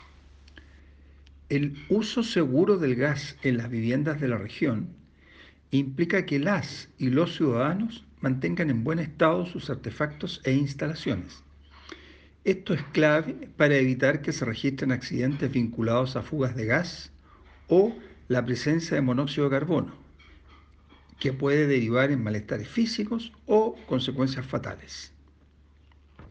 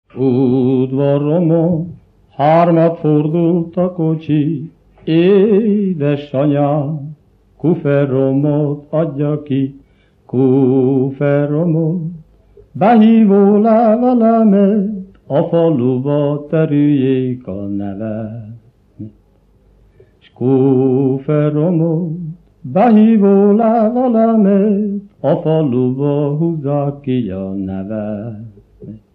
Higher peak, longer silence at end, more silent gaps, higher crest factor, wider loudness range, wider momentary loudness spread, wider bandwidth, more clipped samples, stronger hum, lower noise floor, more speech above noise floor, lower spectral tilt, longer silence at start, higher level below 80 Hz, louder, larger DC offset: second, -8 dBFS vs 0 dBFS; second, 0 s vs 0.2 s; neither; about the same, 18 dB vs 14 dB; second, 3 LU vs 6 LU; about the same, 11 LU vs 13 LU; first, 8.8 kHz vs 4.4 kHz; neither; neither; first, -57 dBFS vs -51 dBFS; second, 32 dB vs 38 dB; second, -6.5 dB/octave vs -11.5 dB/octave; second, 0 s vs 0.15 s; about the same, -54 dBFS vs -54 dBFS; second, -27 LUFS vs -14 LUFS; neither